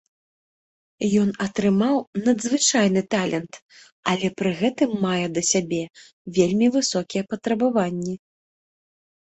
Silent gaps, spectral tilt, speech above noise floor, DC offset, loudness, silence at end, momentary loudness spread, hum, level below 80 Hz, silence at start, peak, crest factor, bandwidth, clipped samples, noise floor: 2.07-2.13 s, 3.62-3.69 s, 3.92-4.03 s, 6.13-6.25 s; -4.5 dB/octave; over 68 dB; under 0.1%; -22 LUFS; 1.1 s; 10 LU; none; -60 dBFS; 1 s; -2 dBFS; 20 dB; 8.4 kHz; under 0.1%; under -90 dBFS